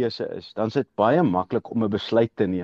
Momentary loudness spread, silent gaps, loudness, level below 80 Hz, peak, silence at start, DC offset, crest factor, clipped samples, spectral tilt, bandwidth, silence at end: 8 LU; none; -23 LUFS; -60 dBFS; -8 dBFS; 0 s; under 0.1%; 16 dB; under 0.1%; -8 dB/octave; 7.4 kHz; 0 s